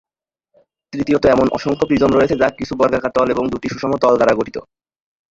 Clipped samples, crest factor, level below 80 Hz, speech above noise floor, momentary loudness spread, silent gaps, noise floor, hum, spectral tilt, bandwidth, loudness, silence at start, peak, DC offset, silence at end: under 0.1%; 16 dB; -44 dBFS; 56 dB; 9 LU; none; -72 dBFS; none; -6.5 dB/octave; 7.8 kHz; -16 LUFS; 0.95 s; 0 dBFS; under 0.1%; 0.7 s